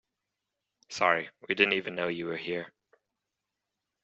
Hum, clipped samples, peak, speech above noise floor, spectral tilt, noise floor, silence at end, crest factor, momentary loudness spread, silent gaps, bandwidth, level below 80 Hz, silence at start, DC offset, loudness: none; under 0.1%; -6 dBFS; 57 dB; -1.5 dB/octave; -86 dBFS; 1.35 s; 28 dB; 12 LU; none; 7.6 kHz; -76 dBFS; 0.9 s; under 0.1%; -29 LUFS